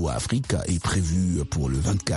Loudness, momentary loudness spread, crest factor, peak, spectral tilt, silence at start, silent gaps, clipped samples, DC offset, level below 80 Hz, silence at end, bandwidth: -25 LUFS; 2 LU; 18 dB; -6 dBFS; -5.5 dB/octave; 0 s; none; under 0.1%; under 0.1%; -34 dBFS; 0 s; 11.5 kHz